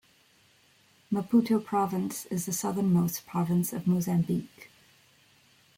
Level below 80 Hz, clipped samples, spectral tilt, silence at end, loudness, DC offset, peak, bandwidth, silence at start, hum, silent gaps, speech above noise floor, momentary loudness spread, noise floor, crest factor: -68 dBFS; under 0.1%; -6.5 dB/octave; 1.1 s; -28 LUFS; under 0.1%; -14 dBFS; 17 kHz; 1.1 s; none; none; 35 dB; 8 LU; -63 dBFS; 16 dB